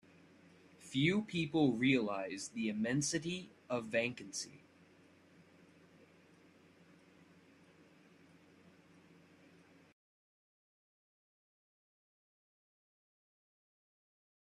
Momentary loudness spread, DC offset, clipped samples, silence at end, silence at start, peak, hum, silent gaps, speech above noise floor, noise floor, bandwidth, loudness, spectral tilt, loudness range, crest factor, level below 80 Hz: 12 LU; under 0.1%; under 0.1%; 10 s; 0.8 s; -20 dBFS; none; none; 29 dB; -65 dBFS; 12.5 kHz; -36 LUFS; -4.5 dB/octave; 11 LU; 22 dB; -78 dBFS